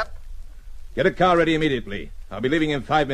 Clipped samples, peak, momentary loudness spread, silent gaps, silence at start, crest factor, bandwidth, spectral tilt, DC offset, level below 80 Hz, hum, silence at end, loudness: under 0.1%; -6 dBFS; 16 LU; none; 0 s; 16 dB; 11.5 kHz; -6 dB/octave; under 0.1%; -38 dBFS; none; 0 s; -21 LUFS